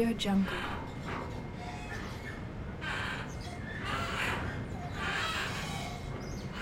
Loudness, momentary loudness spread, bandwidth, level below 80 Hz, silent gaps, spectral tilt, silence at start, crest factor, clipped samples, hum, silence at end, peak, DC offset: -36 LUFS; 10 LU; 16 kHz; -48 dBFS; none; -5 dB/octave; 0 s; 18 dB; under 0.1%; none; 0 s; -18 dBFS; under 0.1%